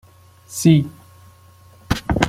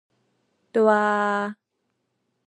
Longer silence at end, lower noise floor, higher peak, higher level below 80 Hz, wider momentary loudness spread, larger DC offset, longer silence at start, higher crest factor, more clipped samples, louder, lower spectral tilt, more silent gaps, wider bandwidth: second, 0 s vs 0.95 s; second, -48 dBFS vs -76 dBFS; first, -2 dBFS vs -6 dBFS; first, -36 dBFS vs -82 dBFS; first, 16 LU vs 9 LU; neither; second, 0.5 s vs 0.75 s; about the same, 20 dB vs 20 dB; neither; first, -18 LUFS vs -22 LUFS; about the same, -5.5 dB/octave vs -6 dB/octave; neither; first, 15.5 kHz vs 8.6 kHz